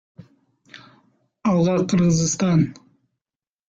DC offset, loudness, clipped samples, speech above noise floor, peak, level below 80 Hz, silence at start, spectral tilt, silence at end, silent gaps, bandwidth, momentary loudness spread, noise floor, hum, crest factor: under 0.1%; -20 LUFS; under 0.1%; over 72 dB; -8 dBFS; -54 dBFS; 0.75 s; -6 dB/octave; 0.95 s; none; 7.8 kHz; 6 LU; under -90 dBFS; none; 16 dB